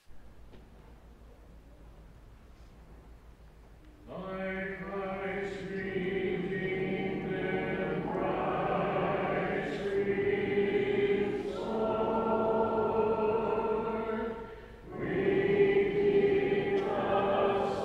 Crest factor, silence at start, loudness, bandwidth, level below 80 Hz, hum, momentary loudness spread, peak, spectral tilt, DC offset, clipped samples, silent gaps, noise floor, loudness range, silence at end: 18 dB; 0.1 s; -31 LUFS; 8 kHz; -54 dBFS; none; 10 LU; -14 dBFS; -7.5 dB/octave; under 0.1%; under 0.1%; none; -54 dBFS; 10 LU; 0 s